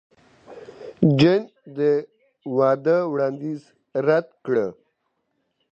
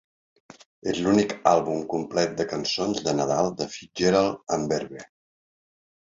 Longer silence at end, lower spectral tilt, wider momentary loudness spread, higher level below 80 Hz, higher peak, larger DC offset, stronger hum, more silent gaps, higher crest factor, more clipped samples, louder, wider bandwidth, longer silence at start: about the same, 1 s vs 1.1 s; first, -8 dB/octave vs -4.5 dB/octave; first, 19 LU vs 10 LU; about the same, -62 dBFS vs -58 dBFS; about the same, -2 dBFS vs -4 dBFS; neither; neither; neither; about the same, 20 dB vs 22 dB; neither; first, -22 LUFS vs -25 LUFS; about the same, 8 kHz vs 7.8 kHz; second, 0.5 s vs 0.85 s